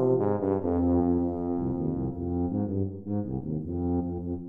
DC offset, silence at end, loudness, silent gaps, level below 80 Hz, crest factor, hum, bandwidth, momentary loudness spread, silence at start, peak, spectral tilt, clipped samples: under 0.1%; 0 s; -29 LUFS; none; -46 dBFS; 14 dB; none; 2.4 kHz; 8 LU; 0 s; -14 dBFS; -13.5 dB/octave; under 0.1%